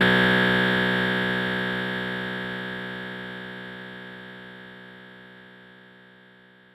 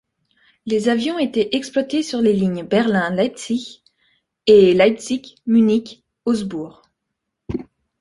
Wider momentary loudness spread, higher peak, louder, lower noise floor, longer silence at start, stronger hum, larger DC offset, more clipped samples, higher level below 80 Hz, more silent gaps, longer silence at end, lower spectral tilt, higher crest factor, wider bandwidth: first, 24 LU vs 17 LU; second, -8 dBFS vs -2 dBFS; second, -24 LUFS vs -18 LUFS; second, -53 dBFS vs -78 dBFS; second, 0 s vs 0.65 s; neither; neither; neither; about the same, -56 dBFS vs -54 dBFS; neither; first, 1 s vs 0.4 s; about the same, -6 dB/octave vs -5.5 dB/octave; about the same, 20 dB vs 18 dB; first, 15 kHz vs 11.5 kHz